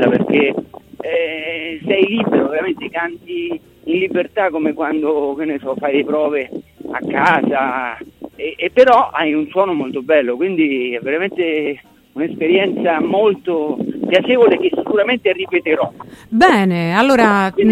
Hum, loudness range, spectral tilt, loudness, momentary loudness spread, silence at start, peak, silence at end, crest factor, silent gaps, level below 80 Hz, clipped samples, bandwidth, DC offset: none; 4 LU; -6.5 dB/octave; -16 LUFS; 12 LU; 0 s; 0 dBFS; 0 s; 16 dB; none; -54 dBFS; under 0.1%; 13.5 kHz; under 0.1%